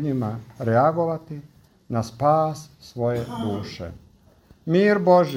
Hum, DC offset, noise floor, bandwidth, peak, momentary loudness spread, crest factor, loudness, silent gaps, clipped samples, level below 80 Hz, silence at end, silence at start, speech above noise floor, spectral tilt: none; under 0.1%; -54 dBFS; 16 kHz; -6 dBFS; 20 LU; 18 dB; -22 LUFS; none; under 0.1%; -56 dBFS; 0 s; 0 s; 32 dB; -7.5 dB/octave